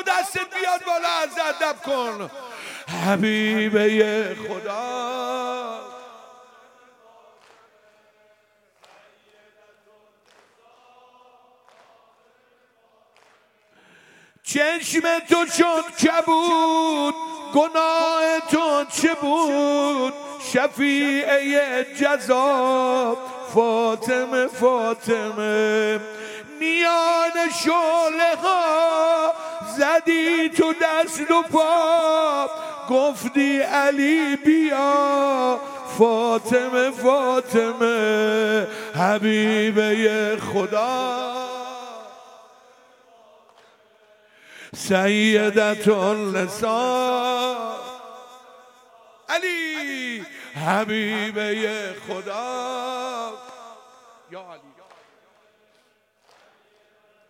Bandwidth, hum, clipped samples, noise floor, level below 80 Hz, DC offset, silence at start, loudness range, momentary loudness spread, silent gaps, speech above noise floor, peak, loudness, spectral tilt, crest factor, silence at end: 16.5 kHz; none; under 0.1%; -63 dBFS; -70 dBFS; under 0.1%; 0 s; 10 LU; 12 LU; none; 42 dB; -2 dBFS; -21 LUFS; -4 dB/octave; 20 dB; 2.7 s